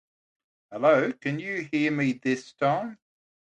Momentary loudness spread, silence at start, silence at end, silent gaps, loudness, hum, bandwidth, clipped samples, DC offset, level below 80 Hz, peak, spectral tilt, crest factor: 9 LU; 0.7 s; 0.65 s; none; -26 LUFS; none; 9.2 kHz; under 0.1%; under 0.1%; -76 dBFS; -8 dBFS; -6.5 dB/octave; 20 dB